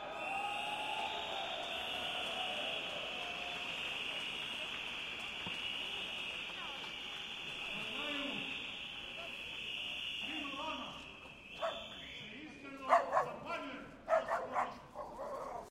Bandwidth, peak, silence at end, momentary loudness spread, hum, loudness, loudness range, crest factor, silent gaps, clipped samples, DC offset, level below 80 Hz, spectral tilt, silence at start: 16 kHz; -16 dBFS; 0 s; 10 LU; none; -40 LUFS; 4 LU; 26 dB; none; under 0.1%; under 0.1%; -68 dBFS; -2.5 dB/octave; 0 s